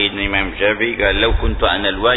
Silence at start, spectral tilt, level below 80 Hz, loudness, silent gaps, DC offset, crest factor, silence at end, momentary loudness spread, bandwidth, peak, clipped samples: 0 s; -7.5 dB/octave; -24 dBFS; -16 LUFS; none; under 0.1%; 14 dB; 0 s; 3 LU; 4.1 kHz; -2 dBFS; under 0.1%